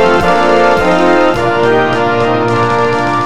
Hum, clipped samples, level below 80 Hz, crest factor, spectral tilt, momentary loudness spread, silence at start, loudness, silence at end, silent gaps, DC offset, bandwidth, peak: none; under 0.1%; -38 dBFS; 10 dB; -6 dB/octave; 3 LU; 0 s; -10 LUFS; 0 s; none; 5%; 13 kHz; 0 dBFS